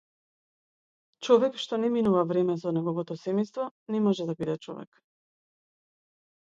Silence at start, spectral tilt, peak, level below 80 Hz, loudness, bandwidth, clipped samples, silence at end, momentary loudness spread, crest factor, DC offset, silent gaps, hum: 1.2 s; -7 dB/octave; -8 dBFS; -72 dBFS; -27 LUFS; 7.8 kHz; under 0.1%; 1.6 s; 13 LU; 22 dB; under 0.1%; 3.71-3.86 s; none